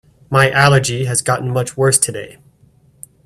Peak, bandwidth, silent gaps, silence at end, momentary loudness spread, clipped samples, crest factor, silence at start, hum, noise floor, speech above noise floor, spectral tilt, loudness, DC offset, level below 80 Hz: 0 dBFS; 14 kHz; none; 0.95 s; 9 LU; under 0.1%; 16 dB; 0.3 s; none; -51 dBFS; 37 dB; -4 dB/octave; -14 LUFS; under 0.1%; -48 dBFS